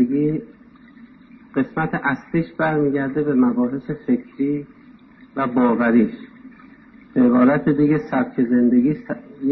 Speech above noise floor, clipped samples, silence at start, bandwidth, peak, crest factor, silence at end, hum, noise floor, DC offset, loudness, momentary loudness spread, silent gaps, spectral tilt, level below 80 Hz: 28 dB; under 0.1%; 0 s; 4.3 kHz; -4 dBFS; 16 dB; 0 s; none; -46 dBFS; under 0.1%; -19 LUFS; 11 LU; none; -11 dB/octave; -56 dBFS